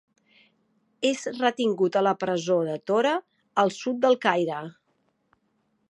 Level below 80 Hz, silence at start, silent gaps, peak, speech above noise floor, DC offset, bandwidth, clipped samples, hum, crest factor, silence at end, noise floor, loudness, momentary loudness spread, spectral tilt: -80 dBFS; 1 s; none; -6 dBFS; 47 dB; under 0.1%; 11 kHz; under 0.1%; none; 22 dB; 1.2 s; -71 dBFS; -25 LUFS; 8 LU; -5 dB/octave